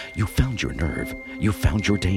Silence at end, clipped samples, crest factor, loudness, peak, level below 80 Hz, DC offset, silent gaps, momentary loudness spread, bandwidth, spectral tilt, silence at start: 0 s; under 0.1%; 16 dB; -24 LUFS; -6 dBFS; -30 dBFS; under 0.1%; none; 6 LU; 16.5 kHz; -6 dB/octave; 0 s